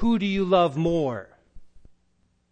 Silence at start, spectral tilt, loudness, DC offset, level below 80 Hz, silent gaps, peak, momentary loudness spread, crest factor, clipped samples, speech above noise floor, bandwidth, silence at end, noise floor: 0 s; -7.5 dB/octave; -23 LUFS; under 0.1%; -44 dBFS; none; -6 dBFS; 9 LU; 18 dB; under 0.1%; 45 dB; 9 kHz; 0.75 s; -68 dBFS